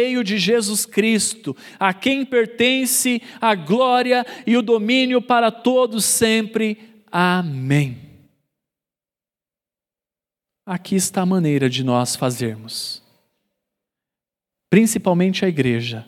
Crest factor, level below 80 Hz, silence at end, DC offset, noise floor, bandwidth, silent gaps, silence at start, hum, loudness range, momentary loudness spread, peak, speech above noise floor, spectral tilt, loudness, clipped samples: 18 dB; -64 dBFS; 0.05 s; under 0.1%; under -90 dBFS; 16.5 kHz; none; 0 s; none; 8 LU; 10 LU; 0 dBFS; over 72 dB; -4 dB/octave; -18 LUFS; under 0.1%